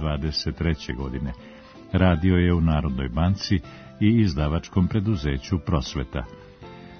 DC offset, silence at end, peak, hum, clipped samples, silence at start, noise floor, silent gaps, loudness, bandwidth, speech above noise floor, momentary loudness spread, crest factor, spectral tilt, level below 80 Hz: under 0.1%; 0 s; -4 dBFS; none; under 0.1%; 0 s; -43 dBFS; none; -24 LUFS; 6.6 kHz; 20 dB; 18 LU; 20 dB; -7 dB/octave; -36 dBFS